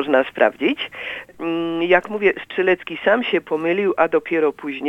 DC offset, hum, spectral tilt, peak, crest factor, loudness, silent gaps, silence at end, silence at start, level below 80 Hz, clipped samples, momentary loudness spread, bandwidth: under 0.1%; none; -6.5 dB/octave; 0 dBFS; 20 dB; -20 LUFS; none; 0 s; 0 s; -62 dBFS; under 0.1%; 8 LU; 7.8 kHz